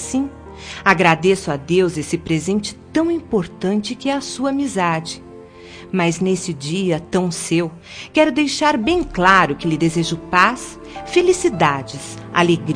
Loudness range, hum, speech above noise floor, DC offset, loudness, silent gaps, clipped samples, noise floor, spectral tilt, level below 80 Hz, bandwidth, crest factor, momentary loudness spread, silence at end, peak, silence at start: 5 LU; none; 21 dB; under 0.1%; -18 LUFS; none; under 0.1%; -38 dBFS; -5 dB/octave; -44 dBFS; 10.5 kHz; 18 dB; 14 LU; 0 s; 0 dBFS; 0 s